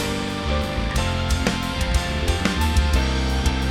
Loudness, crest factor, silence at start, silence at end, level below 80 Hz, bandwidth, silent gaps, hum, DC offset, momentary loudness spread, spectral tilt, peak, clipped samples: -22 LUFS; 18 dB; 0 s; 0 s; -24 dBFS; 15.5 kHz; none; none; 0.2%; 4 LU; -5 dB/octave; -4 dBFS; under 0.1%